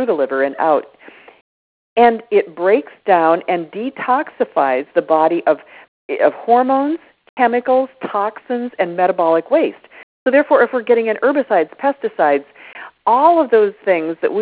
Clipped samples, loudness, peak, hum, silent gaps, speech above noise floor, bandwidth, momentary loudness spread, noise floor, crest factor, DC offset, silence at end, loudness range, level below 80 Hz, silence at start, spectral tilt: under 0.1%; -16 LUFS; 0 dBFS; none; 1.41-1.96 s, 5.88-6.09 s, 7.29-7.37 s, 10.03-10.26 s; over 75 dB; 4 kHz; 9 LU; under -90 dBFS; 16 dB; under 0.1%; 0 s; 2 LU; -66 dBFS; 0 s; -9 dB/octave